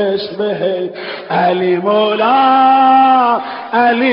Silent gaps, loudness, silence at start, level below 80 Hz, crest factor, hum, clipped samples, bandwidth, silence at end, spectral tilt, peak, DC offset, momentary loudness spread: none; -12 LUFS; 0 s; -64 dBFS; 12 dB; none; under 0.1%; 5.6 kHz; 0 s; -10.5 dB/octave; -2 dBFS; under 0.1%; 10 LU